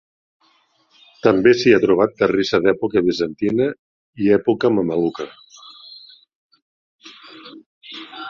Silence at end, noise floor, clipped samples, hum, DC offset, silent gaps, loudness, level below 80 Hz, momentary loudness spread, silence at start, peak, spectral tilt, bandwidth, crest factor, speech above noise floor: 0 s; -60 dBFS; under 0.1%; none; under 0.1%; 3.79-4.13 s, 6.35-6.50 s, 6.62-6.99 s, 7.66-7.81 s; -17 LUFS; -56 dBFS; 25 LU; 1.25 s; 0 dBFS; -6 dB/octave; 7.2 kHz; 20 dB; 43 dB